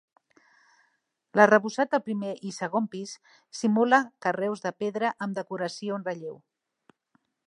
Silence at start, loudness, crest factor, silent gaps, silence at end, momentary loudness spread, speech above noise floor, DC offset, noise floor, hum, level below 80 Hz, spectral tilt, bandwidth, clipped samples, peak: 1.35 s; -26 LUFS; 24 dB; none; 1.1 s; 17 LU; 47 dB; under 0.1%; -74 dBFS; none; -82 dBFS; -5 dB/octave; 11 kHz; under 0.1%; -4 dBFS